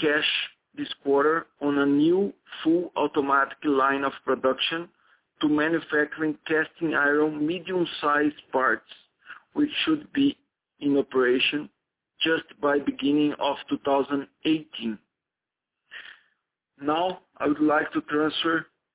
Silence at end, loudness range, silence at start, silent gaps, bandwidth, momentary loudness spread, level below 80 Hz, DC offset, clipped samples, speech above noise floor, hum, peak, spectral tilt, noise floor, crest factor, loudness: 0.3 s; 5 LU; 0 s; none; 4 kHz; 11 LU; -66 dBFS; under 0.1%; under 0.1%; 63 dB; none; -10 dBFS; -8.5 dB/octave; -88 dBFS; 16 dB; -25 LUFS